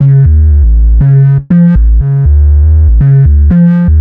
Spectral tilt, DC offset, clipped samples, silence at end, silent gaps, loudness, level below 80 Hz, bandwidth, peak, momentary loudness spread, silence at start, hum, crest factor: -13 dB/octave; under 0.1%; under 0.1%; 0 s; none; -7 LUFS; -8 dBFS; 2.4 kHz; 0 dBFS; 2 LU; 0 s; none; 4 dB